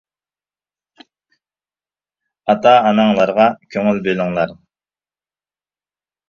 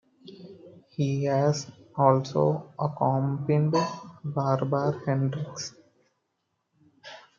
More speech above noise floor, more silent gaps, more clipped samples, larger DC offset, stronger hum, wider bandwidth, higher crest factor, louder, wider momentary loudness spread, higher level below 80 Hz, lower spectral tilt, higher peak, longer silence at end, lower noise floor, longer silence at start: first, over 76 dB vs 53 dB; neither; neither; neither; first, 50 Hz at -50 dBFS vs none; about the same, 7 kHz vs 7.4 kHz; about the same, 18 dB vs 22 dB; first, -15 LUFS vs -27 LUFS; second, 10 LU vs 20 LU; first, -58 dBFS vs -70 dBFS; about the same, -7 dB/octave vs -7 dB/octave; first, 0 dBFS vs -6 dBFS; first, 1.75 s vs 0.2 s; first, under -90 dBFS vs -78 dBFS; first, 2.45 s vs 0.25 s